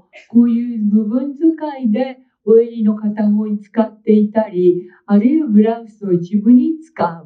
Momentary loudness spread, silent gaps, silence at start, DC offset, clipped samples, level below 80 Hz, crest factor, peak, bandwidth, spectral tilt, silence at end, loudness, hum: 8 LU; none; 0.15 s; under 0.1%; under 0.1%; -72 dBFS; 14 dB; 0 dBFS; 4.6 kHz; -10.5 dB/octave; 0.05 s; -15 LUFS; none